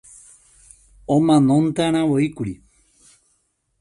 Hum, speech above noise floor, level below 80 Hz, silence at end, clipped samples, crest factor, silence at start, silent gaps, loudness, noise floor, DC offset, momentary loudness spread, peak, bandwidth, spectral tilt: none; 50 dB; -52 dBFS; 1.25 s; under 0.1%; 16 dB; 1.1 s; none; -18 LUFS; -68 dBFS; under 0.1%; 17 LU; -4 dBFS; 11.5 kHz; -7 dB/octave